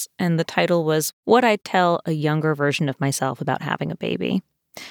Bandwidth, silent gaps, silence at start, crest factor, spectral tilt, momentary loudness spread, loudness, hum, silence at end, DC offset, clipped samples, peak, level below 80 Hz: over 20 kHz; 1.13-1.23 s; 0 s; 18 dB; -5 dB/octave; 8 LU; -21 LUFS; none; 0 s; under 0.1%; under 0.1%; -4 dBFS; -68 dBFS